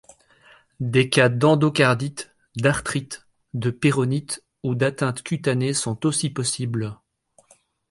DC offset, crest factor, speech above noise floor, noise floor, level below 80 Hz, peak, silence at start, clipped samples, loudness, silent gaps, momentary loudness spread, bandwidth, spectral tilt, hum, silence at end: under 0.1%; 20 dB; 38 dB; -60 dBFS; -56 dBFS; -2 dBFS; 0.8 s; under 0.1%; -22 LUFS; none; 15 LU; 11.5 kHz; -5 dB/octave; none; 0.95 s